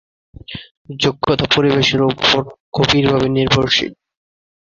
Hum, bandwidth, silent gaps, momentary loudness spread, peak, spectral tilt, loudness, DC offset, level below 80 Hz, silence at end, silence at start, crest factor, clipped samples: none; 7.6 kHz; 0.71-0.85 s, 2.60-2.72 s; 19 LU; 0 dBFS; -5 dB/octave; -15 LUFS; under 0.1%; -42 dBFS; 0.75 s; 0.5 s; 16 dB; under 0.1%